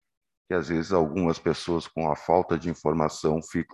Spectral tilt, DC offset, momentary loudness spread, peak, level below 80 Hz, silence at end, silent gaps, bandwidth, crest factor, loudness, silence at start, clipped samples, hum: -6.5 dB/octave; under 0.1%; 5 LU; -6 dBFS; -48 dBFS; 0.1 s; none; 12 kHz; 20 dB; -26 LUFS; 0.5 s; under 0.1%; none